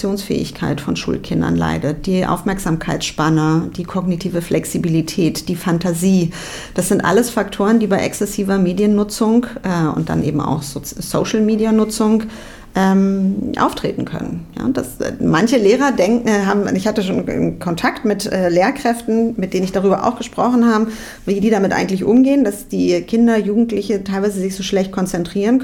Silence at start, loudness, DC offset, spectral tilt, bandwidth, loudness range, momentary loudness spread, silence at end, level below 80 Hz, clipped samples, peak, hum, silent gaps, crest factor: 0 s; -17 LUFS; under 0.1%; -6 dB/octave; 18 kHz; 3 LU; 7 LU; 0 s; -40 dBFS; under 0.1%; -2 dBFS; none; none; 14 dB